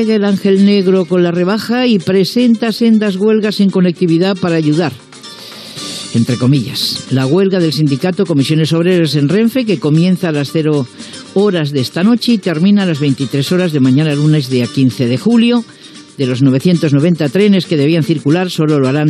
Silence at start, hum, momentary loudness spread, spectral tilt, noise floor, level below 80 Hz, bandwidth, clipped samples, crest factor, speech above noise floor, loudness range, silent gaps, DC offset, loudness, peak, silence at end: 0 s; none; 6 LU; -6.5 dB/octave; -32 dBFS; -60 dBFS; 13.5 kHz; under 0.1%; 12 dB; 20 dB; 3 LU; none; under 0.1%; -12 LUFS; 0 dBFS; 0 s